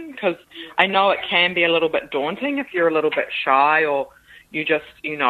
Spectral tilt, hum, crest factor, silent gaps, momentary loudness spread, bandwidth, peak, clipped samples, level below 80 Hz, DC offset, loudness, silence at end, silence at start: -5.5 dB/octave; none; 20 dB; none; 10 LU; 13.5 kHz; 0 dBFS; under 0.1%; -62 dBFS; under 0.1%; -19 LUFS; 0 s; 0 s